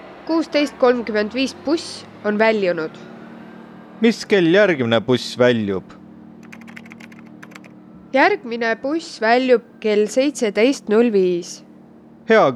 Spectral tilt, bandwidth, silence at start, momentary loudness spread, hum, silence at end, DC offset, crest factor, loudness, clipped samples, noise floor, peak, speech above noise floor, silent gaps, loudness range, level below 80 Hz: -5 dB/octave; 12.5 kHz; 0 s; 23 LU; none; 0 s; under 0.1%; 16 dB; -18 LUFS; under 0.1%; -44 dBFS; -4 dBFS; 27 dB; none; 5 LU; -64 dBFS